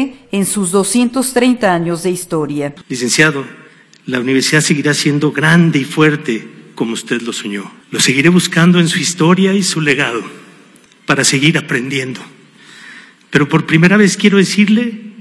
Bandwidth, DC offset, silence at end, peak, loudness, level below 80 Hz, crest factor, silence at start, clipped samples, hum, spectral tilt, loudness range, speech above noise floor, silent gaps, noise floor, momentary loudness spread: 12 kHz; under 0.1%; 0 s; 0 dBFS; -13 LUFS; -56 dBFS; 14 dB; 0 s; under 0.1%; none; -4.5 dB/octave; 3 LU; 32 dB; none; -44 dBFS; 12 LU